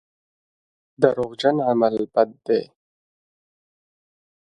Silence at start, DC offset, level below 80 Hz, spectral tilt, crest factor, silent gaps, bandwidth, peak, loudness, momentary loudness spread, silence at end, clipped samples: 1 s; under 0.1%; -66 dBFS; -7 dB/octave; 24 dB; none; 9.8 kHz; 0 dBFS; -21 LUFS; 4 LU; 1.85 s; under 0.1%